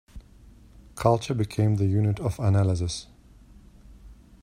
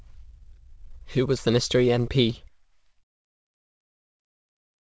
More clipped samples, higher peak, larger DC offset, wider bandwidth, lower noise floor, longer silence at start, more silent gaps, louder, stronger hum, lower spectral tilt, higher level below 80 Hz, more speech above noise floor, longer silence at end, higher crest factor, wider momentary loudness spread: neither; first, -4 dBFS vs -10 dBFS; neither; first, 13 kHz vs 8 kHz; second, -51 dBFS vs -62 dBFS; second, 0.15 s vs 0.3 s; neither; about the same, -25 LUFS vs -23 LUFS; neither; first, -7 dB/octave vs -5.5 dB/octave; about the same, -48 dBFS vs -48 dBFS; second, 28 dB vs 39 dB; second, 0.3 s vs 2.6 s; about the same, 22 dB vs 18 dB; about the same, 8 LU vs 7 LU